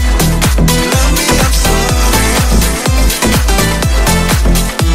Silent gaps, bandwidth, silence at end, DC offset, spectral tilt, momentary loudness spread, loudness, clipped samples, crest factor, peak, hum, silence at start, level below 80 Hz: none; 16.5 kHz; 0 s; 2%; -4 dB/octave; 2 LU; -11 LUFS; under 0.1%; 10 dB; 0 dBFS; none; 0 s; -12 dBFS